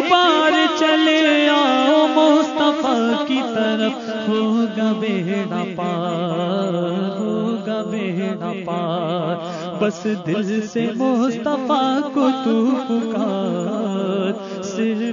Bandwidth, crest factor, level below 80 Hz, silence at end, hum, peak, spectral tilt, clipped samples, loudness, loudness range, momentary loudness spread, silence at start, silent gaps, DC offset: 7.4 kHz; 18 dB; -68 dBFS; 0 s; none; -2 dBFS; -5.5 dB/octave; under 0.1%; -19 LUFS; 7 LU; 9 LU; 0 s; none; under 0.1%